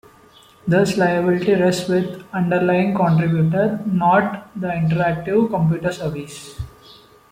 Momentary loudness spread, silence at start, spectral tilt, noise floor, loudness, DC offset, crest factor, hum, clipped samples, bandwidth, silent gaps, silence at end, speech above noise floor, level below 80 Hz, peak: 13 LU; 0.65 s; -7 dB/octave; -49 dBFS; -19 LUFS; under 0.1%; 14 dB; none; under 0.1%; 15.5 kHz; none; 0.65 s; 31 dB; -48 dBFS; -4 dBFS